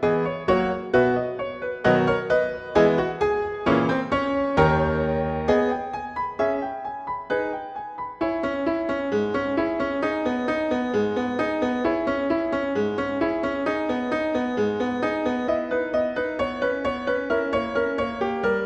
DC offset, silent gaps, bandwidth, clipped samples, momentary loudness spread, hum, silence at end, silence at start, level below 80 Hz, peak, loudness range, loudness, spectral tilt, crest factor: under 0.1%; none; 8.4 kHz; under 0.1%; 7 LU; none; 0 s; 0 s; -46 dBFS; -6 dBFS; 5 LU; -24 LUFS; -7 dB/octave; 18 dB